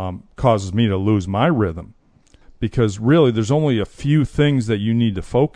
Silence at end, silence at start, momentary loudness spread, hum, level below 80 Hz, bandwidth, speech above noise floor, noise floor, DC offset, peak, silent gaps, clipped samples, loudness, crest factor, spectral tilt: 0.05 s; 0 s; 7 LU; none; -40 dBFS; 10 kHz; 34 dB; -52 dBFS; under 0.1%; -2 dBFS; none; under 0.1%; -18 LUFS; 16 dB; -7.5 dB/octave